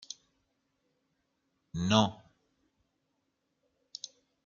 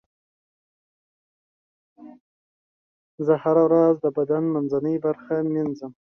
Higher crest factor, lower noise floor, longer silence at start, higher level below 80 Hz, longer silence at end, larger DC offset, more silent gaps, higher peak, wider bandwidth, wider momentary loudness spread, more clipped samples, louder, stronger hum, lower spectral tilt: first, 30 dB vs 18 dB; second, -80 dBFS vs under -90 dBFS; second, 0.1 s vs 2 s; about the same, -68 dBFS vs -70 dBFS; first, 2.3 s vs 0.2 s; neither; second, none vs 2.20-3.18 s; about the same, -8 dBFS vs -6 dBFS; first, 7.4 kHz vs 6 kHz; first, 21 LU vs 9 LU; neither; second, -29 LUFS vs -22 LUFS; neither; second, -5 dB/octave vs -10.5 dB/octave